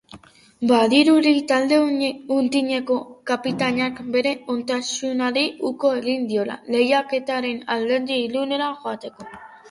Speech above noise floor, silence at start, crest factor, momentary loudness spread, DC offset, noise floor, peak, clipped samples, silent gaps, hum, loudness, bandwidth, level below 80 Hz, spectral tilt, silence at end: 26 dB; 0.15 s; 18 dB; 10 LU; under 0.1%; -46 dBFS; -4 dBFS; under 0.1%; none; none; -21 LUFS; 11.5 kHz; -66 dBFS; -4 dB/octave; 0 s